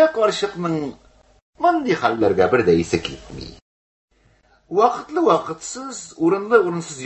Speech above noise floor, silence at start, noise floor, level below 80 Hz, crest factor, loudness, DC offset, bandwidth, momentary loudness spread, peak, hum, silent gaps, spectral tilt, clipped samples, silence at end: 38 dB; 0 s; -57 dBFS; -48 dBFS; 20 dB; -19 LUFS; under 0.1%; 8.6 kHz; 15 LU; -2 dBFS; none; 1.42-1.53 s, 3.62-4.08 s; -5 dB/octave; under 0.1%; 0 s